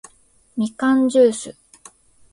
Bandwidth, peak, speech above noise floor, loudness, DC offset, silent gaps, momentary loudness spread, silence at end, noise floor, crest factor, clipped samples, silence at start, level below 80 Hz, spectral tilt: 11.5 kHz; -4 dBFS; 39 dB; -18 LUFS; under 0.1%; none; 17 LU; 0.8 s; -56 dBFS; 16 dB; under 0.1%; 0.55 s; -62 dBFS; -4.5 dB/octave